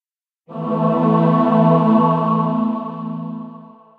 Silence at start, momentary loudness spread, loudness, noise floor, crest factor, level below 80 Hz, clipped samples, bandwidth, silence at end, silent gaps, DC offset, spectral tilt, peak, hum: 0.5 s; 16 LU; -16 LUFS; -55 dBFS; 16 dB; -74 dBFS; under 0.1%; 4.7 kHz; 0.3 s; none; under 0.1%; -10.5 dB/octave; -2 dBFS; none